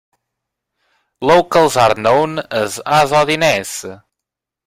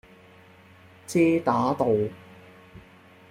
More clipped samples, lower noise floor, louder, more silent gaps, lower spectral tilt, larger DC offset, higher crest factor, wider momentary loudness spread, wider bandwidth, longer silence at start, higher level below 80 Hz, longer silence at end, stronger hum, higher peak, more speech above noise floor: neither; first, -82 dBFS vs -52 dBFS; first, -14 LUFS vs -24 LUFS; neither; second, -4 dB/octave vs -6.5 dB/octave; neither; about the same, 16 dB vs 20 dB; second, 10 LU vs 19 LU; about the same, 16 kHz vs 15.5 kHz; about the same, 1.2 s vs 1.1 s; first, -50 dBFS vs -64 dBFS; first, 0.7 s vs 0.5 s; neither; first, 0 dBFS vs -8 dBFS; first, 69 dB vs 30 dB